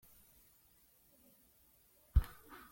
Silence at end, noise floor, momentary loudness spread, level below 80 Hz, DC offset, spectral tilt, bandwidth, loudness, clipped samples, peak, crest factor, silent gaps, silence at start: 0.45 s; -69 dBFS; 27 LU; -42 dBFS; under 0.1%; -6.5 dB/octave; 17 kHz; -39 LUFS; under 0.1%; -16 dBFS; 26 dB; none; 2.15 s